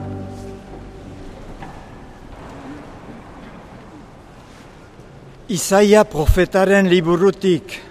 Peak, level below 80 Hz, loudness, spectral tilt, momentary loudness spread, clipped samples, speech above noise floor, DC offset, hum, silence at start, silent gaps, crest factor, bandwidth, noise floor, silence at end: 0 dBFS; -32 dBFS; -15 LUFS; -5.5 dB/octave; 25 LU; under 0.1%; 27 dB; under 0.1%; none; 0 s; none; 20 dB; 15.5 kHz; -41 dBFS; 0.1 s